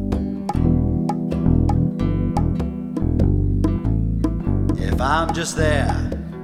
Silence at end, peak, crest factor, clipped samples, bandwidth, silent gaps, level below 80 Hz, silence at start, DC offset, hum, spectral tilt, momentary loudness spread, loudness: 0 s; -4 dBFS; 14 dB; under 0.1%; 13 kHz; none; -26 dBFS; 0 s; under 0.1%; none; -7 dB/octave; 5 LU; -21 LUFS